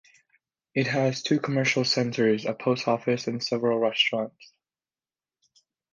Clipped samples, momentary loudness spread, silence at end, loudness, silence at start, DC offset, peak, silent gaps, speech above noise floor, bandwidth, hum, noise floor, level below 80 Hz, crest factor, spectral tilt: under 0.1%; 6 LU; 1.5 s; -25 LUFS; 0.75 s; under 0.1%; -8 dBFS; none; over 65 dB; 9.8 kHz; none; under -90 dBFS; -72 dBFS; 18 dB; -5 dB/octave